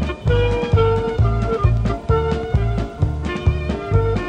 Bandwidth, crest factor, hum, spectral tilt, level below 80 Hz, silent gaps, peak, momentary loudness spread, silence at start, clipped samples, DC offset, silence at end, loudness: 8.6 kHz; 14 dB; none; -8 dB/octave; -24 dBFS; none; -4 dBFS; 5 LU; 0 s; under 0.1%; under 0.1%; 0 s; -19 LUFS